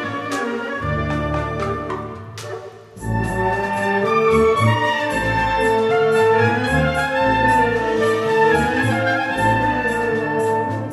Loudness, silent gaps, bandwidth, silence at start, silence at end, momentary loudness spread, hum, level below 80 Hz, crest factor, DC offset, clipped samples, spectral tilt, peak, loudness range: -18 LUFS; none; 13.5 kHz; 0 s; 0 s; 10 LU; none; -36 dBFS; 16 dB; under 0.1%; under 0.1%; -6 dB/octave; -4 dBFS; 7 LU